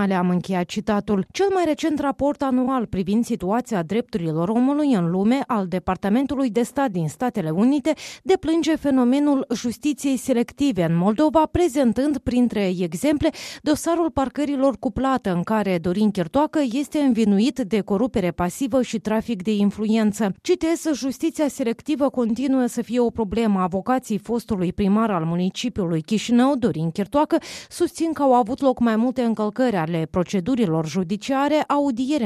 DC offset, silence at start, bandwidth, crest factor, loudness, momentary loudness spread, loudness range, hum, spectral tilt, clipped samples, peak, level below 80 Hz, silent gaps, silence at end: under 0.1%; 0 s; 14 kHz; 14 dB; -22 LUFS; 6 LU; 2 LU; none; -6.5 dB/octave; under 0.1%; -6 dBFS; -48 dBFS; none; 0 s